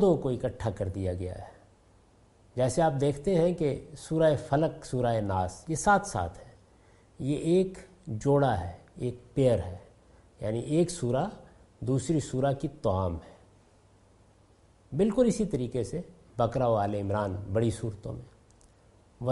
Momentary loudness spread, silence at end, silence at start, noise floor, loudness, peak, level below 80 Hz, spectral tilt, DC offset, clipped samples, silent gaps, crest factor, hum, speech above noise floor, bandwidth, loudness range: 13 LU; 0 s; 0 s; -60 dBFS; -29 LUFS; -12 dBFS; -52 dBFS; -7 dB/octave; under 0.1%; under 0.1%; none; 18 dB; none; 32 dB; 11.5 kHz; 4 LU